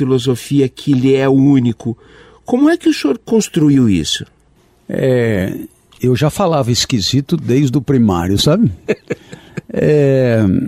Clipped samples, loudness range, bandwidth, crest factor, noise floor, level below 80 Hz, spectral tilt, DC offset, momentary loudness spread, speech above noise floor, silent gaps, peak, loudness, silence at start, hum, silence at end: under 0.1%; 2 LU; 15.5 kHz; 12 dB; -52 dBFS; -42 dBFS; -6 dB/octave; under 0.1%; 12 LU; 38 dB; none; -2 dBFS; -14 LUFS; 0 s; none; 0 s